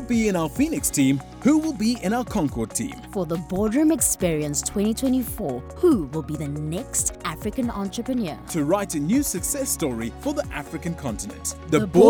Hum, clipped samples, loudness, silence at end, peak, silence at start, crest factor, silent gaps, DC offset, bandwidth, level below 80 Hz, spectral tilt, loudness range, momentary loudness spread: none; under 0.1%; -24 LUFS; 0 s; -2 dBFS; 0 s; 20 dB; none; under 0.1%; 19.5 kHz; -42 dBFS; -5 dB/octave; 3 LU; 9 LU